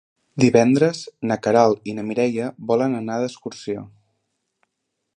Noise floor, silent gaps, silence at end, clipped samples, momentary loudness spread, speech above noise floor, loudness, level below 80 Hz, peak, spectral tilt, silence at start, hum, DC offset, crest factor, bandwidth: -77 dBFS; none; 1.3 s; under 0.1%; 15 LU; 58 dB; -20 LUFS; -62 dBFS; -2 dBFS; -6 dB/octave; 0.35 s; none; under 0.1%; 20 dB; 10 kHz